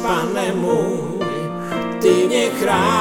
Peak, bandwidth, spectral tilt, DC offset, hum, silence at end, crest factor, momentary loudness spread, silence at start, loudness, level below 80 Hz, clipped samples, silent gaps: -2 dBFS; 17.5 kHz; -5 dB/octave; under 0.1%; none; 0 s; 16 dB; 8 LU; 0 s; -19 LUFS; -50 dBFS; under 0.1%; none